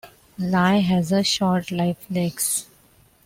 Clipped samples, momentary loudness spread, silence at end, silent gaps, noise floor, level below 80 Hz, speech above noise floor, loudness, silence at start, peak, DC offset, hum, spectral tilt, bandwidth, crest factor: under 0.1%; 7 LU; 0.65 s; none; -56 dBFS; -56 dBFS; 35 dB; -21 LUFS; 0.05 s; -6 dBFS; under 0.1%; none; -4.5 dB/octave; 16.5 kHz; 16 dB